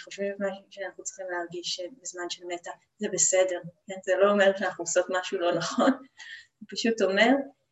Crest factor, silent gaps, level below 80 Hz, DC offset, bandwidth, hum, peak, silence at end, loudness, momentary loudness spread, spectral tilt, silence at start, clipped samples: 20 dB; none; -76 dBFS; under 0.1%; 8.8 kHz; none; -8 dBFS; 0.2 s; -27 LUFS; 16 LU; -2.5 dB/octave; 0 s; under 0.1%